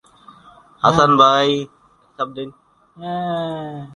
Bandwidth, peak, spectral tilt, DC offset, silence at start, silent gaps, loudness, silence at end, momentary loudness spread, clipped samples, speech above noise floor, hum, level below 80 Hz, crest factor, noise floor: 11 kHz; 0 dBFS; -5 dB/octave; under 0.1%; 0.85 s; none; -17 LUFS; 0 s; 21 LU; under 0.1%; 30 dB; none; -54 dBFS; 20 dB; -47 dBFS